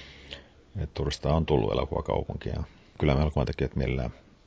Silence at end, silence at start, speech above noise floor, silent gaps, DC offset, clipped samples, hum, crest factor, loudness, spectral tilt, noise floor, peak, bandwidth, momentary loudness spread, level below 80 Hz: 0.3 s; 0 s; 20 dB; none; under 0.1%; under 0.1%; none; 22 dB; -29 LUFS; -7.5 dB/octave; -47 dBFS; -8 dBFS; 8 kHz; 18 LU; -36 dBFS